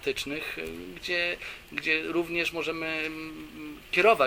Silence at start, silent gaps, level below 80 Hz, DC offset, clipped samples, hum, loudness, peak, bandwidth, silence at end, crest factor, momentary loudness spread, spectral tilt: 0 s; none; -56 dBFS; under 0.1%; under 0.1%; none; -29 LUFS; -6 dBFS; 16.5 kHz; 0 s; 22 dB; 13 LU; -3.5 dB/octave